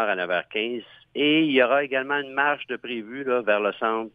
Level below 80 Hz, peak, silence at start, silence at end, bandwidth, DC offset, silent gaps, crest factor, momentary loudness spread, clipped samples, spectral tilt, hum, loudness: -74 dBFS; -6 dBFS; 0 s; 0.05 s; 4.9 kHz; under 0.1%; none; 18 dB; 12 LU; under 0.1%; -7 dB/octave; none; -24 LUFS